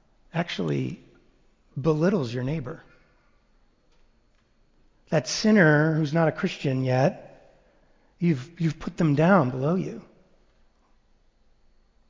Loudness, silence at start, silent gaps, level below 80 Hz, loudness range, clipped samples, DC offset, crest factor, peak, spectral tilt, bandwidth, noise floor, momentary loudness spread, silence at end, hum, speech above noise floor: -24 LUFS; 0.35 s; none; -58 dBFS; 7 LU; under 0.1%; under 0.1%; 20 dB; -6 dBFS; -6.5 dB/octave; 7.6 kHz; -63 dBFS; 16 LU; 2.1 s; none; 40 dB